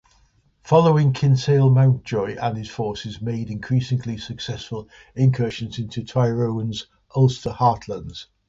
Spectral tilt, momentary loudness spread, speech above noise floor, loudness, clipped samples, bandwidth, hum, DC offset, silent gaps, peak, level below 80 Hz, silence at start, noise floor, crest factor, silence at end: -7.5 dB/octave; 14 LU; 39 dB; -21 LUFS; under 0.1%; 7.6 kHz; none; under 0.1%; none; -4 dBFS; -50 dBFS; 0.65 s; -60 dBFS; 18 dB; 0.25 s